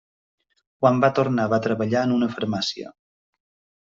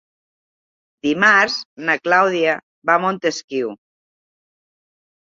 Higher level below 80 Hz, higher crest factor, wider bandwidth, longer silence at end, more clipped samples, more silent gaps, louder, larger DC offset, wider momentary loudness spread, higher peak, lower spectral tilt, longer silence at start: about the same, -64 dBFS vs -68 dBFS; about the same, 20 dB vs 20 dB; about the same, 7.6 kHz vs 7.8 kHz; second, 1.05 s vs 1.45 s; neither; second, none vs 1.65-1.76 s, 2.63-2.82 s, 3.44-3.48 s; second, -22 LUFS vs -17 LUFS; neither; second, 9 LU vs 12 LU; second, -4 dBFS vs 0 dBFS; first, -6.5 dB/octave vs -4 dB/octave; second, 0.8 s vs 1.05 s